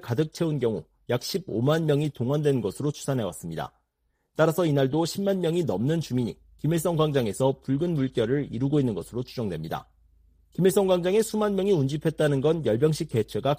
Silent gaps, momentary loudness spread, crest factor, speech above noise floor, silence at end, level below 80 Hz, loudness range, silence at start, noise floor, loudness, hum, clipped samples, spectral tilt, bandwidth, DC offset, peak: none; 10 LU; 16 dB; 49 dB; 0 s; -56 dBFS; 3 LU; 0.05 s; -74 dBFS; -26 LUFS; none; under 0.1%; -6.5 dB/octave; 15.5 kHz; under 0.1%; -8 dBFS